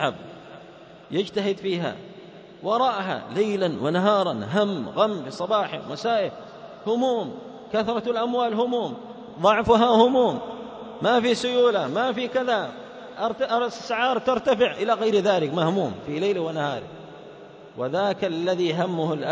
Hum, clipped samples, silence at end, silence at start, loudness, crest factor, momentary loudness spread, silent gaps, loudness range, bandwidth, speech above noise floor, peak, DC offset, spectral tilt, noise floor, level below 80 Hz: none; under 0.1%; 0 s; 0 s; -24 LUFS; 20 dB; 19 LU; none; 5 LU; 8 kHz; 23 dB; -4 dBFS; under 0.1%; -5.5 dB/octave; -46 dBFS; -60 dBFS